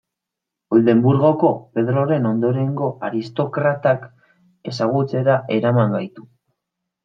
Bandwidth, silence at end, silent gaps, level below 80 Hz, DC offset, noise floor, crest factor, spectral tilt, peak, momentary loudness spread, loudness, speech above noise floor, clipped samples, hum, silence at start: 7.2 kHz; 0.85 s; none; -62 dBFS; under 0.1%; -83 dBFS; 18 dB; -9 dB/octave; -2 dBFS; 9 LU; -19 LUFS; 66 dB; under 0.1%; none; 0.7 s